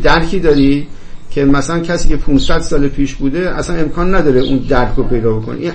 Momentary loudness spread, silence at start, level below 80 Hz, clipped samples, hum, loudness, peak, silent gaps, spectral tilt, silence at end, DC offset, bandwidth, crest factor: 6 LU; 0 s; -18 dBFS; under 0.1%; none; -14 LUFS; 0 dBFS; none; -6 dB/octave; 0 s; under 0.1%; 8.6 kHz; 10 dB